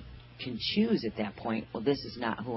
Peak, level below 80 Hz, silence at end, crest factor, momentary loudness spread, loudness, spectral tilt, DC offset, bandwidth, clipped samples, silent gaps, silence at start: -14 dBFS; -56 dBFS; 0 s; 18 dB; 11 LU; -32 LUFS; -9 dB/octave; under 0.1%; 5.8 kHz; under 0.1%; none; 0 s